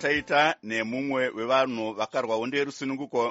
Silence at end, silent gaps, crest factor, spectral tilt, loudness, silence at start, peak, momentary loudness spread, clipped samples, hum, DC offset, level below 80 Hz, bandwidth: 0 s; none; 20 dB; -2 dB/octave; -27 LUFS; 0 s; -8 dBFS; 7 LU; under 0.1%; none; under 0.1%; -64 dBFS; 8 kHz